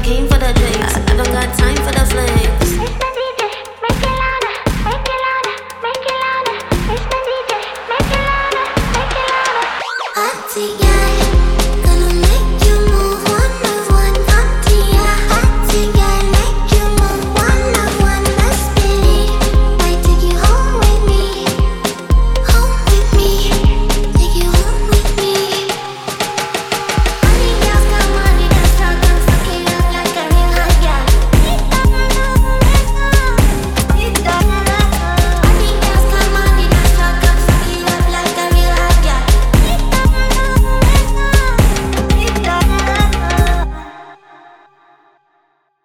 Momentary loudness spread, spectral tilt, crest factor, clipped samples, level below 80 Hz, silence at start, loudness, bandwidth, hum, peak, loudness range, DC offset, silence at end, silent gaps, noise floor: 6 LU; -4.5 dB/octave; 12 dB; under 0.1%; -14 dBFS; 0 s; -14 LUFS; 16.5 kHz; none; 0 dBFS; 4 LU; under 0.1%; 1.7 s; none; -59 dBFS